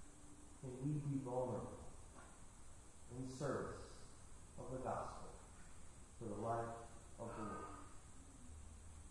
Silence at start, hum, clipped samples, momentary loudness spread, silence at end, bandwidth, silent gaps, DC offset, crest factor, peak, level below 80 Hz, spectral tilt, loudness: 0 s; none; under 0.1%; 17 LU; 0 s; 11.5 kHz; none; under 0.1%; 18 dB; -30 dBFS; -62 dBFS; -6.5 dB/octave; -49 LUFS